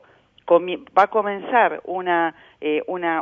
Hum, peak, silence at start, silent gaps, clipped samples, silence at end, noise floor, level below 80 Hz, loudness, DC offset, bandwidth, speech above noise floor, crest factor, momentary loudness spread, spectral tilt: none; -2 dBFS; 0.45 s; none; under 0.1%; 0 s; -41 dBFS; -68 dBFS; -21 LUFS; under 0.1%; 6.8 kHz; 21 dB; 18 dB; 8 LU; -6.5 dB/octave